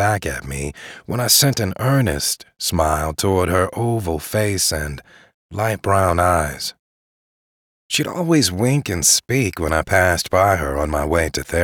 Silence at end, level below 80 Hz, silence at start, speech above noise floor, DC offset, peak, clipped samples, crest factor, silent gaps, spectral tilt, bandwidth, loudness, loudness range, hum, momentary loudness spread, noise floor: 0 s; -36 dBFS; 0 s; over 71 dB; under 0.1%; -4 dBFS; under 0.1%; 16 dB; 5.34-5.49 s, 6.79-7.89 s; -4 dB/octave; over 20 kHz; -18 LUFS; 4 LU; none; 12 LU; under -90 dBFS